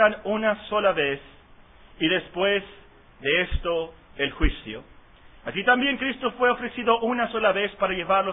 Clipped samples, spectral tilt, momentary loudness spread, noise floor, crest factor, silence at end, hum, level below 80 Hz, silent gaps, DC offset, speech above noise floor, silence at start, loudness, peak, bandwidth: under 0.1%; -9 dB/octave; 10 LU; -51 dBFS; 20 dB; 0 s; none; -38 dBFS; none; under 0.1%; 27 dB; 0 s; -24 LUFS; -4 dBFS; 4 kHz